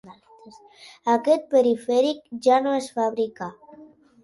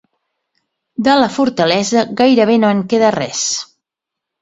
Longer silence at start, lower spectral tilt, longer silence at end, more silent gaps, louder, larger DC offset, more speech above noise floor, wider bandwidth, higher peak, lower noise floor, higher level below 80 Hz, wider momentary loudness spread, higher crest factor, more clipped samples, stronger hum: second, 0.05 s vs 1 s; about the same, -4.5 dB/octave vs -4 dB/octave; second, 0.4 s vs 0.8 s; neither; second, -22 LUFS vs -14 LUFS; neither; second, 27 dB vs 69 dB; first, 11.5 kHz vs 8.2 kHz; second, -6 dBFS vs 0 dBFS; second, -49 dBFS vs -82 dBFS; second, -72 dBFS vs -56 dBFS; first, 10 LU vs 7 LU; about the same, 18 dB vs 16 dB; neither; neither